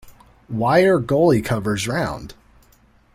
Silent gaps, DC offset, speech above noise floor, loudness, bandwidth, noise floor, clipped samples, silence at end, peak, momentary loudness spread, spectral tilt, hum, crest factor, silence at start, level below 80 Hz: none; under 0.1%; 36 dB; -18 LUFS; 16 kHz; -55 dBFS; under 0.1%; 0.8 s; -4 dBFS; 12 LU; -6 dB/octave; none; 16 dB; 0.05 s; -46 dBFS